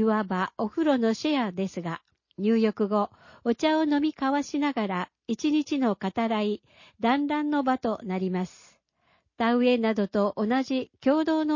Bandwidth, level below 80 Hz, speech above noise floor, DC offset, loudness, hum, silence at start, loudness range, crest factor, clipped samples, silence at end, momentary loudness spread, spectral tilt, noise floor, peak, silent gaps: 7.4 kHz; -66 dBFS; 43 dB; under 0.1%; -27 LUFS; none; 0 s; 1 LU; 16 dB; under 0.1%; 0 s; 8 LU; -6 dB/octave; -69 dBFS; -10 dBFS; none